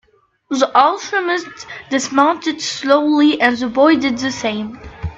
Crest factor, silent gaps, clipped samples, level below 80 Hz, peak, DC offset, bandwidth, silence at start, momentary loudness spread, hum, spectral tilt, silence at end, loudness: 16 dB; none; under 0.1%; -46 dBFS; 0 dBFS; under 0.1%; 8 kHz; 0.5 s; 12 LU; none; -4 dB/octave; 0 s; -16 LUFS